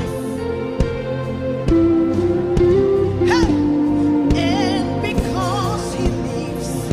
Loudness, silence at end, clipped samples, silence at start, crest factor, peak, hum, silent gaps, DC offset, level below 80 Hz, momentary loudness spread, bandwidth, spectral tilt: -18 LUFS; 0 s; under 0.1%; 0 s; 14 dB; -4 dBFS; none; none; under 0.1%; -30 dBFS; 8 LU; 14.5 kHz; -6.5 dB/octave